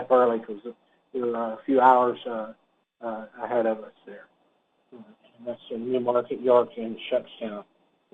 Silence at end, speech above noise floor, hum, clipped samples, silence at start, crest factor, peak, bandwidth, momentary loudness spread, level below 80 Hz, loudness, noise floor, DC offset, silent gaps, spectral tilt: 0.5 s; 43 dB; none; under 0.1%; 0 s; 22 dB; -4 dBFS; 4.1 kHz; 20 LU; -76 dBFS; -25 LUFS; -68 dBFS; under 0.1%; none; -7.5 dB/octave